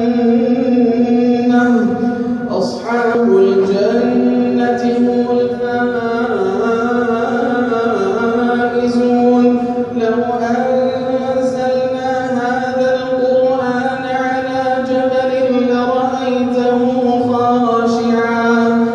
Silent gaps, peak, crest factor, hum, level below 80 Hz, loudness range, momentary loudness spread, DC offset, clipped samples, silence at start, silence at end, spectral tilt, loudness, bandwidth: none; -2 dBFS; 12 dB; none; -52 dBFS; 2 LU; 5 LU; under 0.1%; under 0.1%; 0 s; 0 s; -6.5 dB/octave; -14 LUFS; 7.6 kHz